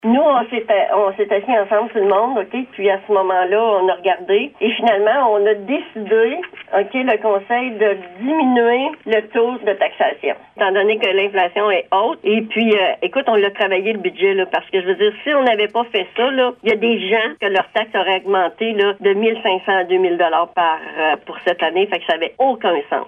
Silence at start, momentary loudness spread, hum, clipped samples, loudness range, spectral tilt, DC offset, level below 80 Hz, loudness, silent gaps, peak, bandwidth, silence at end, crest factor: 0.05 s; 5 LU; none; under 0.1%; 1 LU; -6.5 dB/octave; under 0.1%; -66 dBFS; -17 LUFS; none; -2 dBFS; 3.9 kHz; 0 s; 14 dB